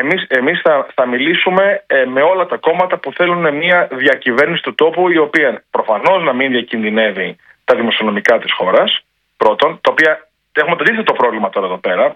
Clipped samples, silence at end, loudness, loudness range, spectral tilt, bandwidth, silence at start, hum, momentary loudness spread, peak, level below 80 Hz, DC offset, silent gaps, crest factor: 0.1%; 0 s; -13 LUFS; 1 LU; -5.5 dB/octave; 8.4 kHz; 0 s; none; 5 LU; 0 dBFS; -62 dBFS; under 0.1%; none; 14 dB